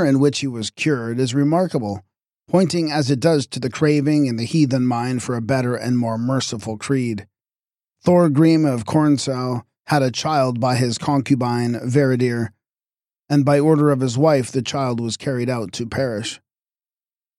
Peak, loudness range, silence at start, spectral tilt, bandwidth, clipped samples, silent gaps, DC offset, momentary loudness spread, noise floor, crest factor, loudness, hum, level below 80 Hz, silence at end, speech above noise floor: -4 dBFS; 3 LU; 0 s; -6 dB/octave; 13.5 kHz; under 0.1%; none; under 0.1%; 10 LU; under -90 dBFS; 16 dB; -19 LUFS; none; -58 dBFS; 1 s; over 72 dB